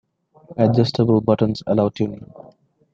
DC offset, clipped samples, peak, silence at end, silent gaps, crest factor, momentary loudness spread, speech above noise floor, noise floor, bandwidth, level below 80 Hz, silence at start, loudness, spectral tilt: under 0.1%; under 0.1%; -4 dBFS; 0.7 s; none; 18 dB; 10 LU; 32 dB; -51 dBFS; 7.4 kHz; -54 dBFS; 0.5 s; -19 LUFS; -8.5 dB/octave